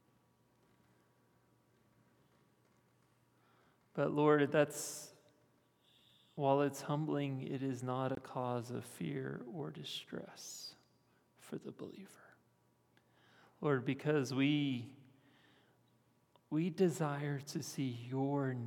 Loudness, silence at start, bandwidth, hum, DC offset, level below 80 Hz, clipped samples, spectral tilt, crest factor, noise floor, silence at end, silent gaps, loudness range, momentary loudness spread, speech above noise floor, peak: -38 LUFS; 3.95 s; 18 kHz; none; under 0.1%; -86 dBFS; under 0.1%; -6 dB/octave; 22 dB; -74 dBFS; 0 s; none; 11 LU; 16 LU; 37 dB; -18 dBFS